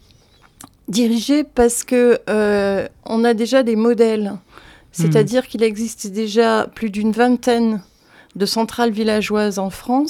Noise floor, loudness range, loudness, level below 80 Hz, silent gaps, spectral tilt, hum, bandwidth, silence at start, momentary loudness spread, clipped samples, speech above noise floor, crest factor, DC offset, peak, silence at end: -51 dBFS; 2 LU; -17 LUFS; -48 dBFS; none; -5 dB/octave; none; 16 kHz; 0.9 s; 9 LU; under 0.1%; 34 dB; 16 dB; under 0.1%; -2 dBFS; 0 s